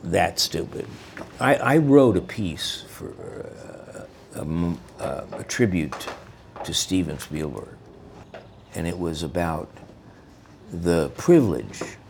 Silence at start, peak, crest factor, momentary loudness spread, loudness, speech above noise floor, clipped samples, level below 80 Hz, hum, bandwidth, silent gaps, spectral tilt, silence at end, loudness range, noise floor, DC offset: 0 s; -2 dBFS; 22 dB; 23 LU; -23 LUFS; 25 dB; under 0.1%; -48 dBFS; none; 19.5 kHz; none; -5 dB/octave; 0 s; 9 LU; -48 dBFS; under 0.1%